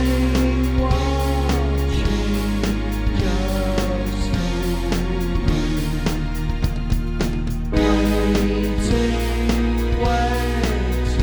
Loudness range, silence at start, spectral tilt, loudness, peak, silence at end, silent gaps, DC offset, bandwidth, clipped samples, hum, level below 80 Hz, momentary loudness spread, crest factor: 3 LU; 0 s; -6 dB/octave; -21 LUFS; -4 dBFS; 0 s; none; under 0.1%; over 20 kHz; under 0.1%; none; -22 dBFS; 5 LU; 16 dB